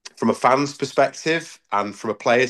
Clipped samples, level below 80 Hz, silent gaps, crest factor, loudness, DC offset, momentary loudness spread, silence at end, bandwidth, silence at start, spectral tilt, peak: under 0.1%; -68 dBFS; none; 18 dB; -21 LUFS; under 0.1%; 7 LU; 0 s; 12.5 kHz; 0.05 s; -4.5 dB/octave; -4 dBFS